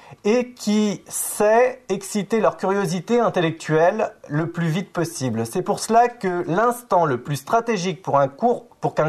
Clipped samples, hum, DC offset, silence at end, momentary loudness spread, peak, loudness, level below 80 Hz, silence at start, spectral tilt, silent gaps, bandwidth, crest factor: under 0.1%; none; under 0.1%; 0 s; 7 LU; -6 dBFS; -21 LUFS; -60 dBFS; 0.1 s; -5.5 dB/octave; none; 13.5 kHz; 16 dB